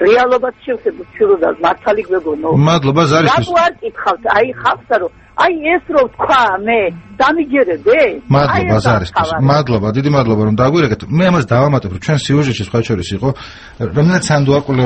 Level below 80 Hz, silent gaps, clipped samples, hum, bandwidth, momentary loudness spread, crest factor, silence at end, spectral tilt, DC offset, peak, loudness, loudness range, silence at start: -40 dBFS; none; under 0.1%; none; 8.8 kHz; 7 LU; 12 dB; 0 s; -6.5 dB/octave; under 0.1%; 0 dBFS; -13 LUFS; 2 LU; 0 s